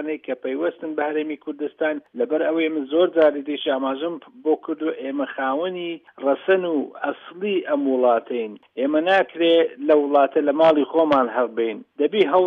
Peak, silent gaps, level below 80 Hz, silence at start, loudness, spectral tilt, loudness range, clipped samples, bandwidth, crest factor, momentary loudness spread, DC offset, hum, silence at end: -6 dBFS; none; -72 dBFS; 0 s; -21 LUFS; -7 dB/octave; 5 LU; under 0.1%; 6.2 kHz; 16 dB; 11 LU; under 0.1%; none; 0 s